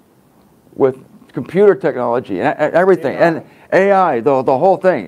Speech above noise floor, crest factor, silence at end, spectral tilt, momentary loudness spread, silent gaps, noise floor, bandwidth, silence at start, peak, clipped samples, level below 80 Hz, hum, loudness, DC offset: 37 dB; 14 dB; 0 s; -7.5 dB/octave; 6 LU; none; -50 dBFS; 11 kHz; 0.8 s; 0 dBFS; under 0.1%; -62 dBFS; none; -14 LUFS; under 0.1%